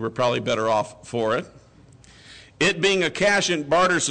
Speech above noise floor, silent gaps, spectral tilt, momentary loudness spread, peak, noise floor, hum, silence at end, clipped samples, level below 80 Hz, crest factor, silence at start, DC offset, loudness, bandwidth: 28 dB; none; -3.5 dB/octave; 7 LU; -12 dBFS; -50 dBFS; none; 0 s; under 0.1%; -56 dBFS; 12 dB; 0 s; under 0.1%; -21 LUFS; 9.4 kHz